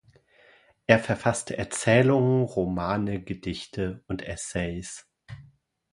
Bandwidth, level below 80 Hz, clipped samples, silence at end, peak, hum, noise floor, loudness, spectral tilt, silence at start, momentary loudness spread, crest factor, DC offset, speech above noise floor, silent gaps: 11.5 kHz; -50 dBFS; under 0.1%; 0.5 s; 0 dBFS; none; -58 dBFS; -26 LUFS; -5.5 dB/octave; 0.9 s; 20 LU; 26 dB; under 0.1%; 33 dB; none